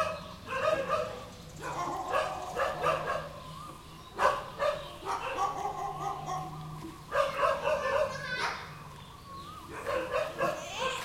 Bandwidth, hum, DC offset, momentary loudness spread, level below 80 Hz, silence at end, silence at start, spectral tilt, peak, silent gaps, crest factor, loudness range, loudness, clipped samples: 16.5 kHz; none; under 0.1%; 15 LU; -56 dBFS; 0 s; 0 s; -4 dB/octave; -12 dBFS; none; 22 dB; 2 LU; -33 LUFS; under 0.1%